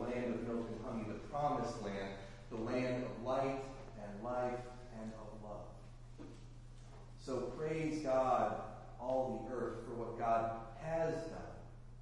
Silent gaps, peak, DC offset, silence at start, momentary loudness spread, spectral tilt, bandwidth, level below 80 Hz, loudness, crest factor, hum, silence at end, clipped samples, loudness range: none; -22 dBFS; under 0.1%; 0 s; 19 LU; -6.5 dB/octave; 11.5 kHz; -56 dBFS; -41 LUFS; 18 dB; none; 0 s; under 0.1%; 9 LU